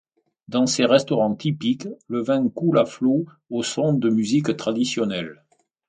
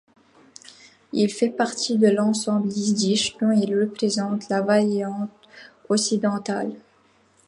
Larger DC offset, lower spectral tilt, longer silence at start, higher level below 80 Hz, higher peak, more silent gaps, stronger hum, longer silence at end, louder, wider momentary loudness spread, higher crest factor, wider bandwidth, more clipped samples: neither; about the same, -5.5 dB/octave vs -4.5 dB/octave; second, 0.5 s vs 1.15 s; first, -64 dBFS vs -70 dBFS; first, -2 dBFS vs -6 dBFS; neither; neither; second, 0.55 s vs 0.7 s; about the same, -22 LUFS vs -22 LUFS; about the same, 9 LU vs 9 LU; about the same, 20 dB vs 18 dB; second, 9.4 kHz vs 11.5 kHz; neither